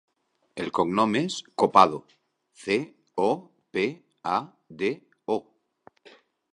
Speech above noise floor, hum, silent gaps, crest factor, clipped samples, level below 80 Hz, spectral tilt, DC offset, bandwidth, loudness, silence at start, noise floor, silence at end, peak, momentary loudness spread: 34 dB; none; none; 26 dB; under 0.1%; -68 dBFS; -5 dB/octave; under 0.1%; 11.5 kHz; -26 LUFS; 0.55 s; -59 dBFS; 1.15 s; -2 dBFS; 16 LU